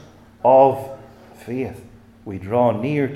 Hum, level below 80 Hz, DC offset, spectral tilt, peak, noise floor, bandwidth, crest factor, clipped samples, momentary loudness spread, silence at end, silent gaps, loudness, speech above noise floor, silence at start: none; -56 dBFS; under 0.1%; -8.5 dB/octave; -2 dBFS; -43 dBFS; 14 kHz; 18 dB; under 0.1%; 25 LU; 0 s; none; -18 LUFS; 25 dB; 0.45 s